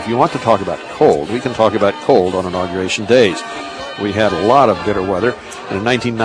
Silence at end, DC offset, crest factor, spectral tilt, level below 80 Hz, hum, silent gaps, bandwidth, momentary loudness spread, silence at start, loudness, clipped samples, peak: 0 s; under 0.1%; 14 dB; -5.5 dB/octave; -46 dBFS; none; none; 10.5 kHz; 12 LU; 0 s; -15 LUFS; under 0.1%; 0 dBFS